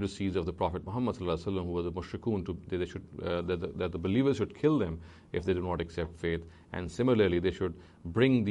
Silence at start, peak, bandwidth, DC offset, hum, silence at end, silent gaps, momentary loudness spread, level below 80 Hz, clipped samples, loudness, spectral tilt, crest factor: 0 s; -14 dBFS; 10.5 kHz; under 0.1%; none; 0 s; none; 12 LU; -50 dBFS; under 0.1%; -32 LUFS; -7.5 dB/octave; 18 dB